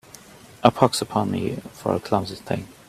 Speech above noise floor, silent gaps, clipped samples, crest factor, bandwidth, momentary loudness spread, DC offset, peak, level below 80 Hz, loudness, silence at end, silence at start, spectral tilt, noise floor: 24 dB; none; under 0.1%; 24 dB; 15 kHz; 11 LU; under 0.1%; 0 dBFS; -56 dBFS; -23 LUFS; 0.15 s; 0.6 s; -5.5 dB/octave; -46 dBFS